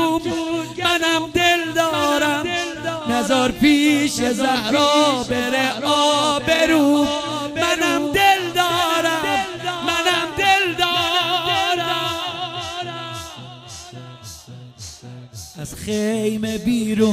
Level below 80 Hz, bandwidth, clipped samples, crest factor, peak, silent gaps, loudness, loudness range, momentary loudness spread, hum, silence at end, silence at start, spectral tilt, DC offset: -48 dBFS; 16 kHz; under 0.1%; 16 dB; -2 dBFS; none; -18 LUFS; 11 LU; 20 LU; none; 0 s; 0 s; -3 dB/octave; under 0.1%